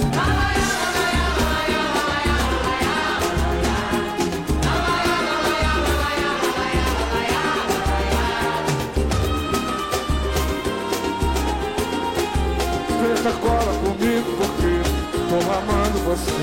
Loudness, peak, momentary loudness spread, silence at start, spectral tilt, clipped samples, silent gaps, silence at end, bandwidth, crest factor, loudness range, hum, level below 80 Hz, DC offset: -21 LUFS; -10 dBFS; 3 LU; 0 s; -4.5 dB/octave; under 0.1%; none; 0 s; 16.5 kHz; 10 dB; 2 LU; none; -28 dBFS; under 0.1%